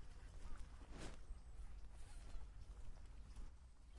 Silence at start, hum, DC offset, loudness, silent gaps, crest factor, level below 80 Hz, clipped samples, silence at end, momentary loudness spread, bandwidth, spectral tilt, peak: 0 s; none; under 0.1%; -60 LUFS; none; 14 dB; -56 dBFS; under 0.1%; 0 s; 5 LU; 11.5 kHz; -5 dB/octave; -38 dBFS